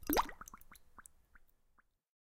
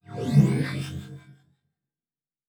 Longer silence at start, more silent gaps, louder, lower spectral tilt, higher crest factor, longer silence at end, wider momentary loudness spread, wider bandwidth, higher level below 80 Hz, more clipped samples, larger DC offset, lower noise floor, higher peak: about the same, 0 s vs 0.1 s; neither; second, -38 LUFS vs -24 LUFS; second, -3 dB/octave vs -7.5 dB/octave; first, 26 dB vs 20 dB; second, 0.9 s vs 1.15 s; first, 24 LU vs 19 LU; first, 16 kHz vs 12 kHz; about the same, -56 dBFS vs -56 dBFS; neither; neither; second, -74 dBFS vs under -90 dBFS; second, -16 dBFS vs -6 dBFS